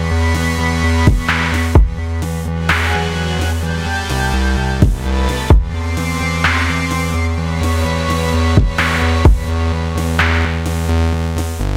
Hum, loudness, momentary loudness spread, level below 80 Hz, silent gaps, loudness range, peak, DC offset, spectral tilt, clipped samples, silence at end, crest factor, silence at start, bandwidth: none; -16 LUFS; 6 LU; -18 dBFS; none; 2 LU; 0 dBFS; 0.3%; -5.5 dB/octave; under 0.1%; 0 s; 14 dB; 0 s; 16 kHz